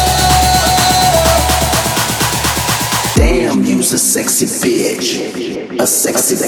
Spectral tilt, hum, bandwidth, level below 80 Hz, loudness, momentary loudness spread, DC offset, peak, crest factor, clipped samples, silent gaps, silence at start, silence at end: -3 dB/octave; none; over 20 kHz; -24 dBFS; -12 LUFS; 6 LU; under 0.1%; 0 dBFS; 12 dB; under 0.1%; none; 0 s; 0 s